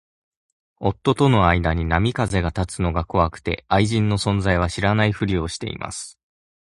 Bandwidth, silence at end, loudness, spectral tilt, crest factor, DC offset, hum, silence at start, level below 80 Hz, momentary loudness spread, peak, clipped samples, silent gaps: 11.5 kHz; 0.55 s; -21 LUFS; -6 dB/octave; 20 dB; under 0.1%; none; 0.8 s; -34 dBFS; 11 LU; 0 dBFS; under 0.1%; none